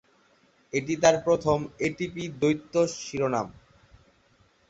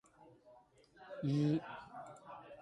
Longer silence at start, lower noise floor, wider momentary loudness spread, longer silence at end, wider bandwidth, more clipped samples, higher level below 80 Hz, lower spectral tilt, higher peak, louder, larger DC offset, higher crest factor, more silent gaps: first, 0.75 s vs 0.2 s; about the same, -63 dBFS vs -65 dBFS; second, 10 LU vs 19 LU; first, 1.15 s vs 0 s; second, 8.2 kHz vs 10.5 kHz; neither; first, -58 dBFS vs -76 dBFS; second, -5 dB/octave vs -8 dB/octave; first, -6 dBFS vs -26 dBFS; first, -26 LUFS vs -38 LUFS; neither; first, 22 dB vs 16 dB; neither